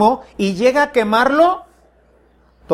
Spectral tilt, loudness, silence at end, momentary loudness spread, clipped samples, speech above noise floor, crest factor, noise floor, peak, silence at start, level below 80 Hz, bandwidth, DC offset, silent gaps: -5.5 dB/octave; -15 LUFS; 0 s; 8 LU; under 0.1%; 38 dB; 16 dB; -53 dBFS; -2 dBFS; 0 s; -50 dBFS; 14.5 kHz; under 0.1%; none